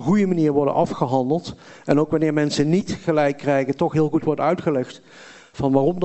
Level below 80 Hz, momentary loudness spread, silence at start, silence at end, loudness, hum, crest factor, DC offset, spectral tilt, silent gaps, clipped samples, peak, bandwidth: -52 dBFS; 7 LU; 0 s; 0 s; -20 LUFS; none; 18 dB; under 0.1%; -7 dB/octave; none; under 0.1%; -2 dBFS; 8.4 kHz